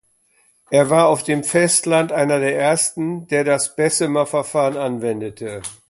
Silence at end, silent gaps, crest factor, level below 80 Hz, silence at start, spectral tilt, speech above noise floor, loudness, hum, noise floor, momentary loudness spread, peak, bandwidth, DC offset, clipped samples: 0.15 s; none; 18 dB; -60 dBFS; 0.7 s; -4 dB/octave; 41 dB; -18 LUFS; none; -59 dBFS; 10 LU; -2 dBFS; 12 kHz; under 0.1%; under 0.1%